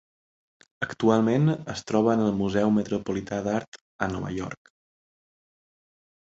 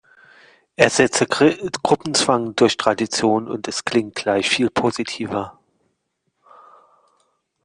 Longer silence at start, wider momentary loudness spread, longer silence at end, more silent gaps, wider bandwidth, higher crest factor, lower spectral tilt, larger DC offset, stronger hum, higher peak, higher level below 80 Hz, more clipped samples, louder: about the same, 0.8 s vs 0.8 s; first, 12 LU vs 9 LU; second, 1.85 s vs 2.15 s; first, 3.68-3.72 s, 3.81-3.99 s vs none; second, 8 kHz vs 10.5 kHz; about the same, 20 dB vs 20 dB; first, -7 dB/octave vs -3.5 dB/octave; neither; neither; second, -6 dBFS vs 0 dBFS; about the same, -56 dBFS vs -58 dBFS; neither; second, -26 LUFS vs -19 LUFS